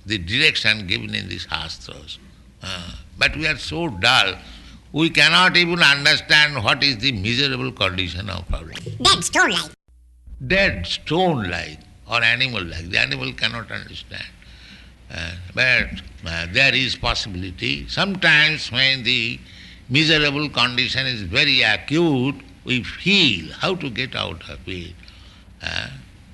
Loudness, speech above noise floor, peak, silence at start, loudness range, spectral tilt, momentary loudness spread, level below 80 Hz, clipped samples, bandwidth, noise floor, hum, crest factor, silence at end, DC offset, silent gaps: -18 LUFS; 24 dB; -2 dBFS; 0.05 s; 7 LU; -3.5 dB/octave; 18 LU; -40 dBFS; under 0.1%; 12 kHz; -44 dBFS; none; 20 dB; 0 s; under 0.1%; none